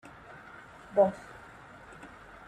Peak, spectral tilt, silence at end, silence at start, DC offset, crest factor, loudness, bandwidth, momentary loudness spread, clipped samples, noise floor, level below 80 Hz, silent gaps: -12 dBFS; -7 dB/octave; 0.4 s; 0.95 s; under 0.1%; 24 dB; -28 LUFS; 10 kHz; 23 LU; under 0.1%; -51 dBFS; -64 dBFS; none